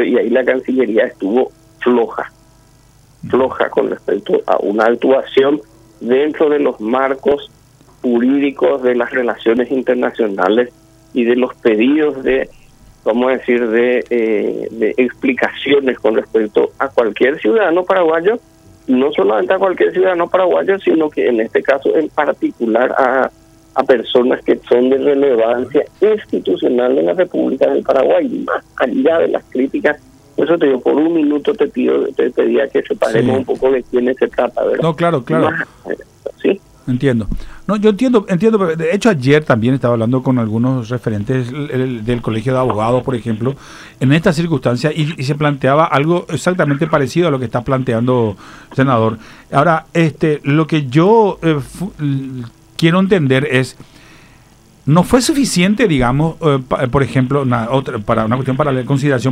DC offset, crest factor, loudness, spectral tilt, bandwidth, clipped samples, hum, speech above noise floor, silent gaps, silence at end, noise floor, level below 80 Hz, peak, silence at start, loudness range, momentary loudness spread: under 0.1%; 14 dB; -15 LUFS; -6.5 dB/octave; 15 kHz; under 0.1%; none; 33 dB; none; 0 s; -47 dBFS; -42 dBFS; 0 dBFS; 0 s; 3 LU; 7 LU